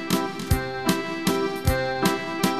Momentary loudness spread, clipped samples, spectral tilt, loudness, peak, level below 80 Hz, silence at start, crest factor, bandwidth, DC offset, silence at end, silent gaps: 2 LU; under 0.1%; -5 dB/octave; -25 LUFS; -6 dBFS; -38 dBFS; 0 s; 18 dB; 14 kHz; 0.4%; 0 s; none